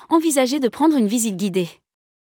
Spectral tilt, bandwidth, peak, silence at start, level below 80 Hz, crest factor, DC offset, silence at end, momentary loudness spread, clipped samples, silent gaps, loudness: -4.5 dB/octave; 18.5 kHz; -6 dBFS; 0.1 s; -72 dBFS; 14 dB; under 0.1%; 0.65 s; 7 LU; under 0.1%; none; -19 LUFS